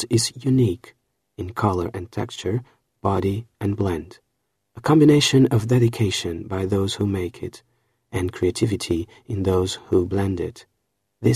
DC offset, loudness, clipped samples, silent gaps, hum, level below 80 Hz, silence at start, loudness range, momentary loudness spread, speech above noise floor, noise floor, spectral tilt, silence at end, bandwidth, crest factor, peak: under 0.1%; -22 LUFS; under 0.1%; none; none; -48 dBFS; 0 s; 6 LU; 14 LU; 54 dB; -75 dBFS; -6 dB/octave; 0 s; 14 kHz; 18 dB; -4 dBFS